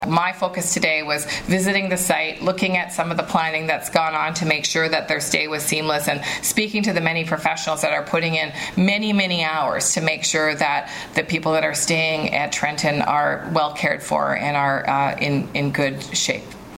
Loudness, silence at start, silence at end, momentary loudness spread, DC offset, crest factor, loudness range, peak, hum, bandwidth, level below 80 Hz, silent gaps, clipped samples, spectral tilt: -20 LUFS; 0 s; 0 s; 4 LU; under 0.1%; 18 dB; 1 LU; -4 dBFS; none; 16.5 kHz; -52 dBFS; none; under 0.1%; -3.5 dB/octave